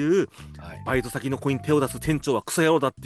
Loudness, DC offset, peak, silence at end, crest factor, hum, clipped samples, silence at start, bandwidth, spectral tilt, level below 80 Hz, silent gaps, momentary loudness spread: -24 LUFS; under 0.1%; -10 dBFS; 0 s; 14 dB; none; under 0.1%; 0 s; 12.5 kHz; -5.5 dB/octave; -48 dBFS; none; 13 LU